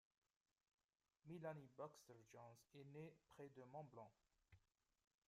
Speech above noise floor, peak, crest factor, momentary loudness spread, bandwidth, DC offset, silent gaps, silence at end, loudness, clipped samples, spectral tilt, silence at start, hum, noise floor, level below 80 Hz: 20 dB; -40 dBFS; 22 dB; 10 LU; 14.5 kHz; under 0.1%; none; 0.7 s; -61 LUFS; under 0.1%; -6.5 dB/octave; 1.25 s; none; -80 dBFS; under -90 dBFS